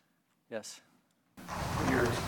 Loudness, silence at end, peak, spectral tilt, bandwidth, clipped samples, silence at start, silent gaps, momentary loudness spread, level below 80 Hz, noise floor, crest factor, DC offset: -35 LUFS; 0 s; -16 dBFS; -5 dB/octave; 18 kHz; under 0.1%; 0.5 s; none; 21 LU; -52 dBFS; -74 dBFS; 20 dB; under 0.1%